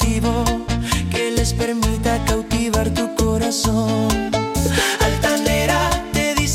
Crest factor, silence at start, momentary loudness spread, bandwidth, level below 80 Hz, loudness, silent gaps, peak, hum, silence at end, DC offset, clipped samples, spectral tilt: 14 dB; 0 s; 3 LU; 16.5 kHz; -26 dBFS; -19 LUFS; none; -4 dBFS; none; 0 s; under 0.1%; under 0.1%; -4.5 dB/octave